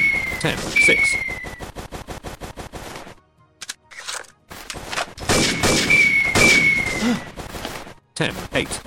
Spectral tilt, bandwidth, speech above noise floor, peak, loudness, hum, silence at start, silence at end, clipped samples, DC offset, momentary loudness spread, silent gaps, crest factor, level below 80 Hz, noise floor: -2.5 dB/octave; 17 kHz; 32 dB; -4 dBFS; -17 LUFS; none; 0 s; 0.05 s; under 0.1%; under 0.1%; 22 LU; none; 16 dB; -40 dBFS; -52 dBFS